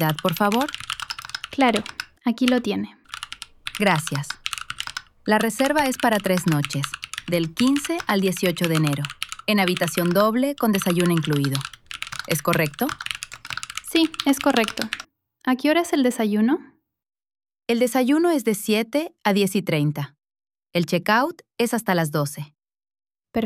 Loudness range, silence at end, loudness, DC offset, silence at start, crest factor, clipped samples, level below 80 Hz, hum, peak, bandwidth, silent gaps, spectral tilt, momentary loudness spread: 3 LU; 0 s; -22 LUFS; under 0.1%; 0 s; 20 dB; under 0.1%; -58 dBFS; none; -2 dBFS; 18 kHz; none; -5 dB/octave; 12 LU